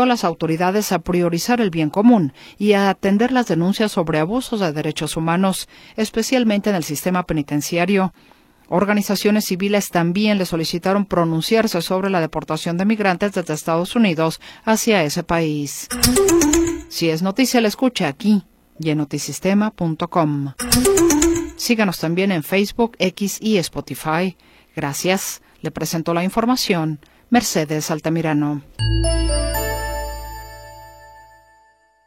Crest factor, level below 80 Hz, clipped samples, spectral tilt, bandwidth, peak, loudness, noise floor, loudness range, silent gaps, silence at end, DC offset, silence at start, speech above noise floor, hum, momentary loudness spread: 18 dB; -36 dBFS; under 0.1%; -4.5 dB/octave; 16.5 kHz; 0 dBFS; -19 LUFS; -56 dBFS; 4 LU; none; 0.85 s; under 0.1%; 0 s; 37 dB; none; 8 LU